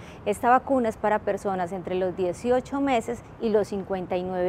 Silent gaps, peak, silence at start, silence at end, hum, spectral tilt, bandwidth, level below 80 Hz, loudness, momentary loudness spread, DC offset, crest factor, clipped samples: none; -6 dBFS; 0 s; 0 s; none; -6 dB/octave; 15 kHz; -52 dBFS; -26 LUFS; 8 LU; under 0.1%; 18 dB; under 0.1%